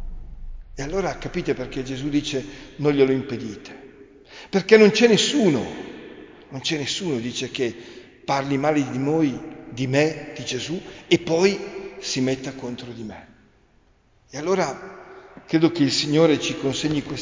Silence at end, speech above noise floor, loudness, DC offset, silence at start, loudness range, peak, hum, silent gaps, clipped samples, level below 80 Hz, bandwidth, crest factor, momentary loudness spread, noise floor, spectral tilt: 0 s; 37 dB; -22 LUFS; under 0.1%; 0 s; 7 LU; 0 dBFS; none; none; under 0.1%; -46 dBFS; 7.6 kHz; 22 dB; 20 LU; -58 dBFS; -5 dB/octave